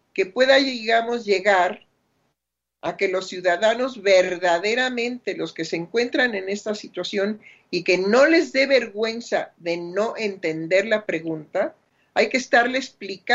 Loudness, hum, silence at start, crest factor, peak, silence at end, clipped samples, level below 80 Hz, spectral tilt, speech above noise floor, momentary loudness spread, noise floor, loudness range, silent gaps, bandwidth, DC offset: -21 LUFS; none; 0.15 s; 18 dB; -4 dBFS; 0 s; under 0.1%; -72 dBFS; -3.5 dB/octave; 60 dB; 12 LU; -82 dBFS; 4 LU; none; 8 kHz; under 0.1%